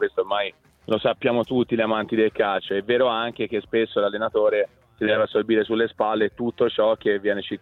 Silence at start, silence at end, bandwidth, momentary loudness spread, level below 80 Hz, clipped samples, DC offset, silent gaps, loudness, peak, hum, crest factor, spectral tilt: 0 s; 0.05 s; 4.3 kHz; 5 LU; -60 dBFS; under 0.1%; under 0.1%; none; -23 LUFS; -8 dBFS; none; 14 dB; -7.5 dB/octave